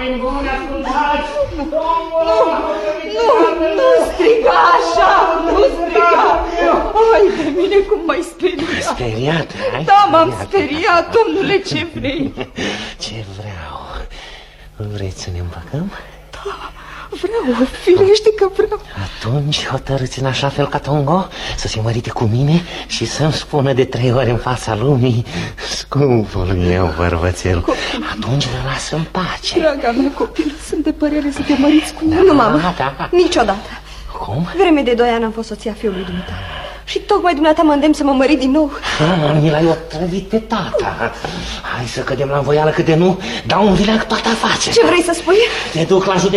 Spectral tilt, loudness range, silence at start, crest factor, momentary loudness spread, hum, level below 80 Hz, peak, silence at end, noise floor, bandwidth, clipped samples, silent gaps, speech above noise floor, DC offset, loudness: -5.5 dB/octave; 6 LU; 0 s; 14 dB; 13 LU; none; -34 dBFS; 0 dBFS; 0 s; -36 dBFS; 13 kHz; under 0.1%; none; 22 dB; under 0.1%; -15 LUFS